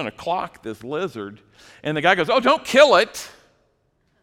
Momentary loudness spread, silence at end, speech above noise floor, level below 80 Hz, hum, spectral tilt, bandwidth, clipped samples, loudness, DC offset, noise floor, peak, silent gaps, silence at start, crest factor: 21 LU; 0.95 s; 46 dB; -60 dBFS; none; -3.5 dB/octave; 16.5 kHz; under 0.1%; -19 LUFS; under 0.1%; -66 dBFS; 0 dBFS; none; 0 s; 20 dB